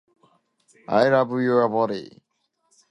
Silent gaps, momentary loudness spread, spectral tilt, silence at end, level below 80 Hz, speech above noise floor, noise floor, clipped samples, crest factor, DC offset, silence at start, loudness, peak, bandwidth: none; 7 LU; -7 dB/octave; 0.85 s; -70 dBFS; 52 dB; -73 dBFS; under 0.1%; 20 dB; under 0.1%; 0.9 s; -21 LUFS; -4 dBFS; 10 kHz